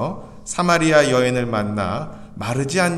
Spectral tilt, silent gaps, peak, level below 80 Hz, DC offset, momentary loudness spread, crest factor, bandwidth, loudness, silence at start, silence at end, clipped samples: -5 dB/octave; none; -2 dBFS; -46 dBFS; under 0.1%; 15 LU; 18 dB; 13.5 kHz; -19 LUFS; 0 s; 0 s; under 0.1%